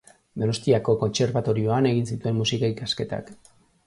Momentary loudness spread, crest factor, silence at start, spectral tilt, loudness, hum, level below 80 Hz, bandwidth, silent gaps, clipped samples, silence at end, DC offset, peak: 7 LU; 18 dB; 0.35 s; -6 dB/octave; -24 LUFS; none; -54 dBFS; 11.5 kHz; none; under 0.1%; 0.55 s; under 0.1%; -6 dBFS